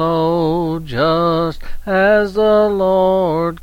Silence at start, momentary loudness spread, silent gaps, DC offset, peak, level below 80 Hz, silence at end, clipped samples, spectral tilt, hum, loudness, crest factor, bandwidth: 0 s; 7 LU; none; 0.3%; -4 dBFS; -34 dBFS; 0 s; under 0.1%; -7.5 dB/octave; none; -15 LUFS; 12 dB; 16.5 kHz